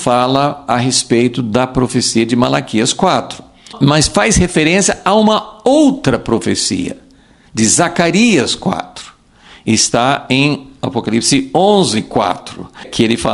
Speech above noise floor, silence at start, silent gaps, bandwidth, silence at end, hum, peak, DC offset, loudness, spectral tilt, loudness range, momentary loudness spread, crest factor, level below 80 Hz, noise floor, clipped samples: 32 dB; 0 s; none; 11.5 kHz; 0 s; none; 0 dBFS; under 0.1%; -13 LUFS; -4 dB/octave; 2 LU; 10 LU; 14 dB; -36 dBFS; -45 dBFS; under 0.1%